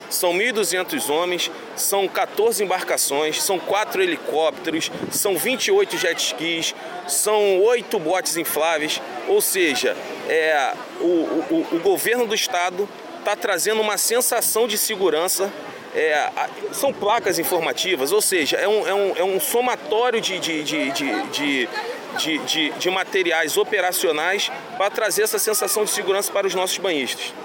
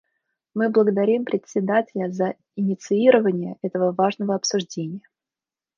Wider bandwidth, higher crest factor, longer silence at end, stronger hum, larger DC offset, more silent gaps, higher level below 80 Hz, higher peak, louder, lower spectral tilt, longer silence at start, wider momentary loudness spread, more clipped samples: first, 17 kHz vs 7.2 kHz; second, 14 dB vs 20 dB; second, 0 s vs 0.8 s; neither; neither; neither; about the same, -70 dBFS vs -74 dBFS; about the same, -6 dBFS vs -4 dBFS; about the same, -20 LUFS vs -22 LUFS; second, -1.5 dB/octave vs -5.5 dB/octave; second, 0 s vs 0.55 s; second, 6 LU vs 11 LU; neither